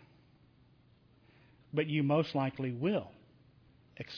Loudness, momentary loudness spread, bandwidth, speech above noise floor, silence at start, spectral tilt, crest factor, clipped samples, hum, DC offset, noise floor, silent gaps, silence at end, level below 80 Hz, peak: -33 LUFS; 11 LU; 5.4 kHz; 33 dB; 1.75 s; -6 dB/octave; 20 dB; under 0.1%; none; under 0.1%; -65 dBFS; none; 0 s; -72 dBFS; -18 dBFS